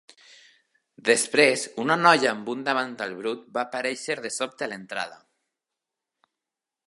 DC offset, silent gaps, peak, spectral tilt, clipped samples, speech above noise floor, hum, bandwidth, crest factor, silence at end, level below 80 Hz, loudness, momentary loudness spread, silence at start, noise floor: under 0.1%; none; -2 dBFS; -2.5 dB/octave; under 0.1%; 63 dB; none; 11.5 kHz; 24 dB; 1.7 s; -80 dBFS; -24 LUFS; 14 LU; 1.05 s; -88 dBFS